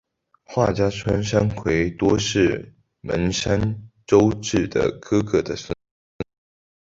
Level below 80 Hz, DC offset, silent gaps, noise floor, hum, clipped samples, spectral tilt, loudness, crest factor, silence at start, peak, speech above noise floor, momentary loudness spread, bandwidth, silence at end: -42 dBFS; under 0.1%; 5.91-6.19 s; -49 dBFS; none; under 0.1%; -5.5 dB/octave; -21 LUFS; 20 dB; 0.5 s; -2 dBFS; 29 dB; 16 LU; 8 kHz; 0.7 s